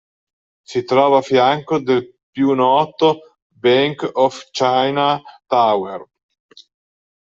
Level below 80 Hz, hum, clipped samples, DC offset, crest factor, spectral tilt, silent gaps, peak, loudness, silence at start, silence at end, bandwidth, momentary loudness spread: -64 dBFS; none; under 0.1%; under 0.1%; 16 dB; -5.5 dB/octave; 2.23-2.33 s, 3.42-3.50 s; -2 dBFS; -17 LUFS; 0.7 s; 1.2 s; 7.8 kHz; 11 LU